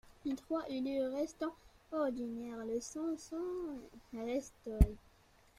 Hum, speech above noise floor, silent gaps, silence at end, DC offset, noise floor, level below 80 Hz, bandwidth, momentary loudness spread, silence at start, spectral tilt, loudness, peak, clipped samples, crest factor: none; 29 dB; none; 0.6 s; under 0.1%; -66 dBFS; -42 dBFS; 15.5 kHz; 11 LU; 0.05 s; -7 dB/octave; -39 LUFS; -12 dBFS; under 0.1%; 26 dB